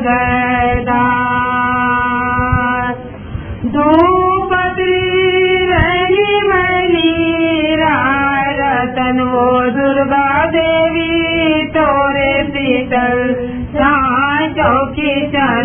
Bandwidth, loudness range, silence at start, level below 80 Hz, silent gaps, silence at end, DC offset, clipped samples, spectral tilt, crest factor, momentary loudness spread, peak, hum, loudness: 3.5 kHz; 2 LU; 0 s; -32 dBFS; none; 0 s; under 0.1%; under 0.1%; -9.5 dB/octave; 12 dB; 4 LU; 0 dBFS; none; -13 LUFS